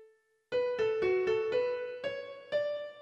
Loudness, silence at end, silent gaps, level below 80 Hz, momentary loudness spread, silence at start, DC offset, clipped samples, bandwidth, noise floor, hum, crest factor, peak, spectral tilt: -33 LUFS; 0 s; none; -70 dBFS; 9 LU; 0 s; under 0.1%; under 0.1%; 8 kHz; -64 dBFS; none; 14 dB; -20 dBFS; -5.5 dB/octave